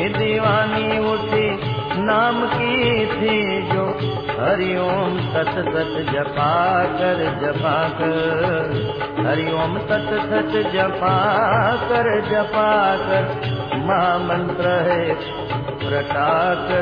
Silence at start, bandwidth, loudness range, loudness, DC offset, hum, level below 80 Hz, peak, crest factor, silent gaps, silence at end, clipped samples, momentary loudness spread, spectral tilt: 0 s; 5.2 kHz; 2 LU; -19 LUFS; under 0.1%; none; -46 dBFS; -4 dBFS; 16 dB; none; 0 s; under 0.1%; 6 LU; -8.5 dB/octave